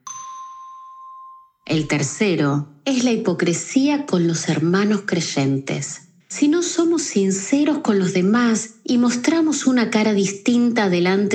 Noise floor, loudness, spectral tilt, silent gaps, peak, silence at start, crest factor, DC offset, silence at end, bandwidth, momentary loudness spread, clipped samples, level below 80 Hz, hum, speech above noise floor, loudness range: -43 dBFS; -19 LUFS; -5 dB/octave; none; -4 dBFS; 0.05 s; 14 dB; under 0.1%; 0 s; 9.4 kHz; 16 LU; under 0.1%; -62 dBFS; none; 25 dB; 3 LU